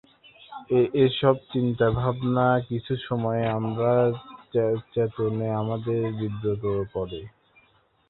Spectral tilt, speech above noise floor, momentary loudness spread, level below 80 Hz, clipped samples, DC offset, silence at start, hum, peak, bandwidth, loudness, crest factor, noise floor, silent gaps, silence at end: -11.5 dB/octave; 38 dB; 8 LU; -52 dBFS; under 0.1%; under 0.1%; 0.4 s; none; -4 dBFS; 4.2 kHz; -25 LUFS; 20 dB; -63 dBFS; none; 0.8 s